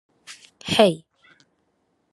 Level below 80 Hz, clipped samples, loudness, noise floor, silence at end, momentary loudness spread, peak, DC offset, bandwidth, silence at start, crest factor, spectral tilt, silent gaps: -64 dBFS; under 0.1%; -19 LUFS; -70 dBFS; 1.15 s; 25 LU; 0 dBFS; under 0.1%; 12.5 kHz; 0.3 s; 24 dB; -4.5 dB/octave; none